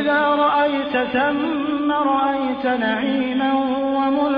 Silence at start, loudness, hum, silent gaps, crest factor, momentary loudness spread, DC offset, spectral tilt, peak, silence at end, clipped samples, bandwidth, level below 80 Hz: 0 s; -19 LUFS; none; none; 12 dB; 4 LU; under 0.1%; -7.5 dB/octave; -8 dBFS; 0 s; under 0.1%; 5.2 kHz; -56 dBFS